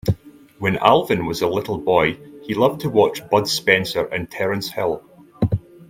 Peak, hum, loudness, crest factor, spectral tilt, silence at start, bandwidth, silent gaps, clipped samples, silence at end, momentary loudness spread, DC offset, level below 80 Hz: 0 dBFS; none; -20 LUFS; 20 dB; -5 dB/octave; 0.05 s; 16.5 kHz; none; under 0.1%; 0.05 s; 9 LU; under 0.1%; -46 dBFS